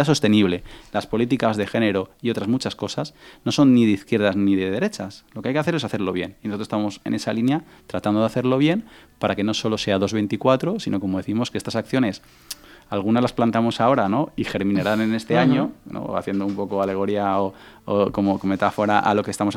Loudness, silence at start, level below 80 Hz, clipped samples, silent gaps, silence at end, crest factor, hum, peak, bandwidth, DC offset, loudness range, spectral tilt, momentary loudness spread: -22 LUFS; 0 s; -54 dBFS; under 0.1%; none; 0 s; 20 dB; none; -2 dBFS; 16 kHz; under 0.1%; 3 LU; -6 dB/octave; 11 LU